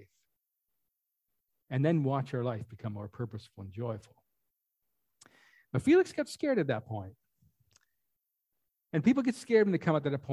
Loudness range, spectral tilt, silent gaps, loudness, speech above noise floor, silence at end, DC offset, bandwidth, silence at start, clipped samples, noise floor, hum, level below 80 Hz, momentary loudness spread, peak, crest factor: 7 LU; -7.5 dB/octave; none; -31 LUFS; 53 dB; 0 s; under 0.1%; 12.5 kHz; 1.7 s; under 0.1%; -83 dBFS; none; -66 dBFS; 15 LU; -14 dBFS; 20 dB